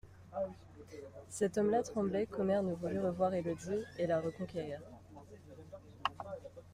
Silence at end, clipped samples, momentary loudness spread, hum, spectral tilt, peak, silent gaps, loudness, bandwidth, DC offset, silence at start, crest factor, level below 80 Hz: 0 s; under 0.1%; 21 LU; none; -6 dB/octave; -16 dBFS; none; -37 LUFS; 15.5 kHz; under 0.1%; 0.05 s; 22 dB; -66 dBFS